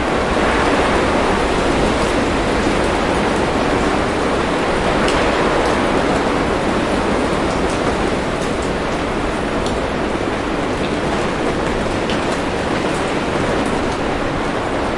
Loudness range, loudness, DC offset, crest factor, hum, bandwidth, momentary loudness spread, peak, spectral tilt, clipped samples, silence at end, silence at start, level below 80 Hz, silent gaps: 3 LU; -17 LUFS; under 0.1%; 14 dB; none; 11.5 kHz; 4 LU; -2 dBFS; -5 dB/octave; under 0.1%; 0 s; 0 s; -30 dBFS; none